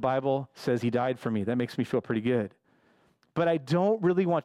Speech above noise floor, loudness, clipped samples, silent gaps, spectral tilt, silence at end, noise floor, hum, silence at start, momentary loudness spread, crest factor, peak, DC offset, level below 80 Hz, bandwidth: 39 dB; -28 LUFS; under 0.1%; none; -8 dB/octave; 0.05 s; -66 dBFS; none; 0 s; 6 LU; 14 dB; -14 dBFS; under 0.1%; -68 dBFS; 13.5 kHz